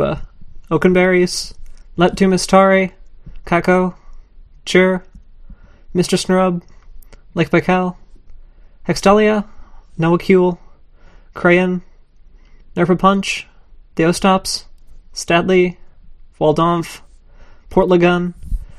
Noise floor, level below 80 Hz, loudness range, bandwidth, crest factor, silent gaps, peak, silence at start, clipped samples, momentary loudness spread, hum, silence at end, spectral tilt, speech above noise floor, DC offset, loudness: -43 dBFS; -36 dBFS; 4 LU; 13.5 kHz; 16 dB; none; 0 dBFS; 0 s; under 0.1%; 16 LU; none; 0.05 s; -5.5 dB/octave; 29 dB; under 0.1%; -15 LUFS